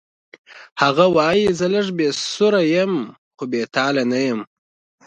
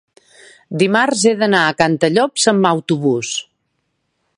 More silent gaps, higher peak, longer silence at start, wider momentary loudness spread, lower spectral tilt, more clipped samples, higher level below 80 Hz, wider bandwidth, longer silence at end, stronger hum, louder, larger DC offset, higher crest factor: first, 0.72-0.76 s, 3.18-3.31 s vs none; about the same, 0 dBFS vs 0 dBFS; second, 0.5 s vs 0.7 s; first, 11 LU vs 7 LU; about the same, -5 dB/octave vs -4 dB/octave; neither; about the same, -58 dBFS vs -62 dBFS; second, 9.8 kHz vs 11.5 kHz; second, 0.6 s vs 0.95 s; neither; second, -18 LUFS vs -15 LUFS; neither; about the same, 20 dB vs 16 dB